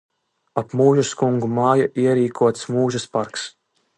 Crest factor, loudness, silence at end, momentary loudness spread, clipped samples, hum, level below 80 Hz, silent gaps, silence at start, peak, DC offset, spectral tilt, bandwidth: 18 dB; -20 LUFS; 0.5 s; 11 LU; under 0.1%; none; -62 dBFS; none; 0.55 s; -2 dBFS; under 0.1%; -6 dB/octave; 11 kHz